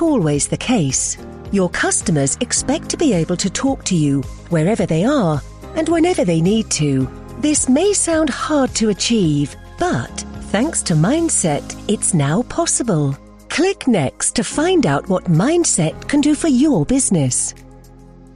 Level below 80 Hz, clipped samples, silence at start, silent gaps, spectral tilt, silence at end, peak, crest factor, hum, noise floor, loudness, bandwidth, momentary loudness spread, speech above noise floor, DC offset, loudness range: -38 dBFS; under 0.1%; 0 s; none; -4.5 dB/octave; 0.1 s; -4 dBFS; 14 dB; none; -41 dBFS; -17 LUFS; 12 kHz; 8 LU; 25 dB; under 0.1%; 2 LU